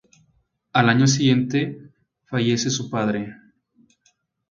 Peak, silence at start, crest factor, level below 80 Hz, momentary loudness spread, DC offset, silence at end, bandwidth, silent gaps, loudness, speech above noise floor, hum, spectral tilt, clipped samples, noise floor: -2 dBFS; 0.75 s; 22 dB; -60 dBFS; 13 LU; under 0.1%; 1.15 s; 7.8 kHz; none; -21 LUFS; 46 dB; none; -5 dB/octave; under 0.1%; -66 dBFS